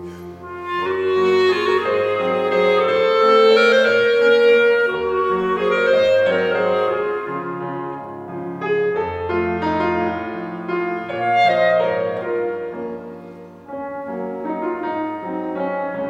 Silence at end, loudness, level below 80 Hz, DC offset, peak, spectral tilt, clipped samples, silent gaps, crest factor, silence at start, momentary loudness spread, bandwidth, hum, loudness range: 0 s; -18 LUFS; -60 dBFS; under 0.1%; -4 dBFS; -5.5 dB/octave; under 0.1%; none; 16 dB; 0 s; 16 LU; 8.6 kHz; none; 9 LU